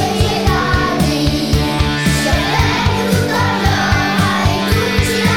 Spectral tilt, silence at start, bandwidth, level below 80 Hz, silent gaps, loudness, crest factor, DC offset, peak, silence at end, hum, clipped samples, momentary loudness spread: -5 dB/octave; 0 s; 17.5 kHz; -24 dBFS; none; -14 LUFS; 14 dB; 0.8%; 0 dBFS; 0 s; none; under 0.1%; 1 LU